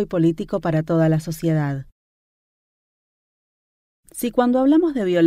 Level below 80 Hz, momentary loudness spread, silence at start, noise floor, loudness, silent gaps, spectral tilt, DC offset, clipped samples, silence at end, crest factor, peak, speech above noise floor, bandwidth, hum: -52 dBFS; 10 LU; 0 s; under -90 dBFS; -20 LUFS; 1.92-4.03 s; -7.5 dB/octave; under 0.1%; under 0.1%; 0 s; 16 dB; -4 dBFS; over 71 dB; 15 kHz; none